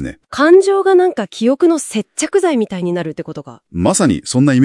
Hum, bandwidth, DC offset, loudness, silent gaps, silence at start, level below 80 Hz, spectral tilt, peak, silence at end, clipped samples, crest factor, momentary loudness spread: none; 12 kHz; under 0.1%; -14 LUFS; none; 0 s; -48 dBFS; -5.5 dB/octave; 0 dBFS; 0 s; under 0.1%; 14 dB; 15 LU